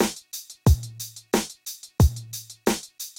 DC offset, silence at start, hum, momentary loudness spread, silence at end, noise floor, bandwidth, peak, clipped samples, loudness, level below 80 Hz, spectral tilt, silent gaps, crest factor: under 0.1%; 0 s; none; 14 LU; 0.1 s; -41 dBFS; 17 kHz; -8 dBFS; under 0.1%; -26 LUFS; -30 dBFS; -5 dB/octave; none; 18 dB